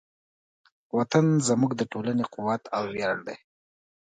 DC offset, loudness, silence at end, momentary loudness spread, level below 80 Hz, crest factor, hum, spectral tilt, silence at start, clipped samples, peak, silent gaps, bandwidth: under 0.1%; -26 LUFS; 0.7 s; 10 LU; -68 dBFS; 20 dB; none; -5.5 dB/octave; 0.95 s; under 0.1%; -6 dBFS; none; 9.4 kHz